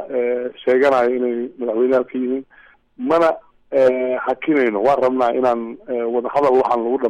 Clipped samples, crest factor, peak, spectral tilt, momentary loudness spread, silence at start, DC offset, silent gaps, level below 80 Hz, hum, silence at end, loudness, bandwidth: under 0.1%; 12 dB; -6 dBFS; -6.5 dB/octave; 8 LU; 0 s; under 0.1%; none; -60 dBFS; none; 0 s; -18 LUFS; 8.6 kHz